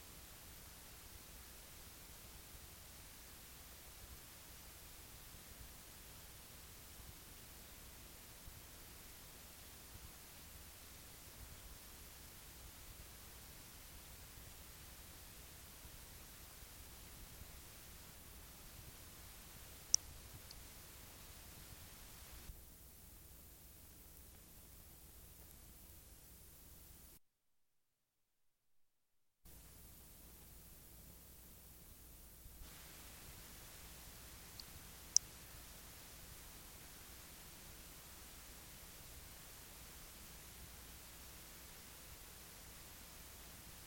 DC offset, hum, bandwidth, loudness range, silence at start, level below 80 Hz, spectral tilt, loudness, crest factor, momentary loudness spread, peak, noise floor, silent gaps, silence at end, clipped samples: under 0.1%; none; 17 kHz; 15 LU; 0 s; -64 dBFS; -1 dB/octave; -52 LUFS; 42 dB; 4 LU; -12 dBFS; -85 dBFS; none; 0 s; under 0.1%